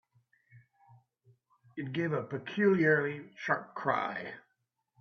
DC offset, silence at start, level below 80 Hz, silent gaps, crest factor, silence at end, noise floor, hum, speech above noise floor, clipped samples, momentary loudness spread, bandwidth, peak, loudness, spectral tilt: under 0.1%; 0.55 s; -78 dBFS; none; 20 dB; 0.6 s; -81 dBFS; none; 49 dB; under 0.1%; 17 LU; 6.6 kHz; -14 dBFS; -32 LUFS; -7.5 dB/octave